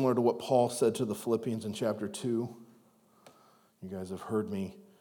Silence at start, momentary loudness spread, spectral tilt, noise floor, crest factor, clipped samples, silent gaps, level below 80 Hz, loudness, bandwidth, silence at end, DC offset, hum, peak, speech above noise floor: 0 s; 14 LU; -6 dB/octave; -64 dBFS; 20 dB; under 0.1%; none; -82 dBFS; -32 LUFS; over 20 kHz; 0.2 s; under 0.1%; none; -14 dBFS; 33 dB